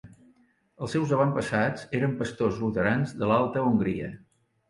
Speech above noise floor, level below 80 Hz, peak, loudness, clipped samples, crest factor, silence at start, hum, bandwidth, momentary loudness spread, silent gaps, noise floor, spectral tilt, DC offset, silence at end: 37 dB; -56 dBFS; -10 dBFS; -27 LUFS; under 0.1%; 18 dB; 0.05 s; none; 11.5 kHz; 6 LU; none; -63 dBFS; -7 dB/octave; under 0.1%; 0.55 s